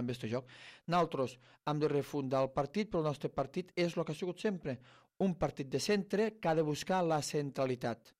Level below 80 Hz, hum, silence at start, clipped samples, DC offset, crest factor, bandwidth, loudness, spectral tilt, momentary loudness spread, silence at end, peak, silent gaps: -64 dBFS; none; 0 s; under 0.1%; under 0.1%; 14 dB; 15 kHz; -36 LUFS; -6 dB/octave; 8 LU; 0.25 s; -20 dBFS; none